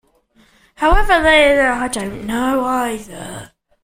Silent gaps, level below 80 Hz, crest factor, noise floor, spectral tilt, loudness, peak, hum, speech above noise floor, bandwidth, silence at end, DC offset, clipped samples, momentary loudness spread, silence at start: none; -26 dBFS; 16 dB; -55 dBFS; -4 dB/octave; -15 LUFS; 0 dBFS; none; 39 dB; 16 kHz; 0.35 s; under 0.1%; under 0.1%; 20 LU; 0.8 s